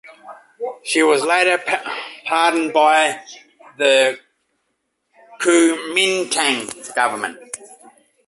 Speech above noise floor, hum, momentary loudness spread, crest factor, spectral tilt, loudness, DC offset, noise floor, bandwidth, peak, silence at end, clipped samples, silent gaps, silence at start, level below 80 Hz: 55 dB; none; 16 LU; 18 dB; -1.5 dB/octave; -17 LUFS; under 0.1%; -72 dBFS; 12 kHz; -2 dBFS; 0.55 s; under 0.1%; none; 0.05 s; -70 dBFS